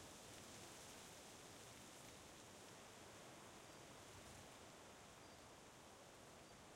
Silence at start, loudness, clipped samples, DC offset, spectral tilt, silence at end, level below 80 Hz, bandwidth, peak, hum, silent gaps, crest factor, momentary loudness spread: 0 s; -60 LUFS; under 0.1%; under 0.1%; -2.5 dB/octave; 0 s; -80 dBFS; 16 kHz; -44 dBFS; none; none; 16 dB; 4 LU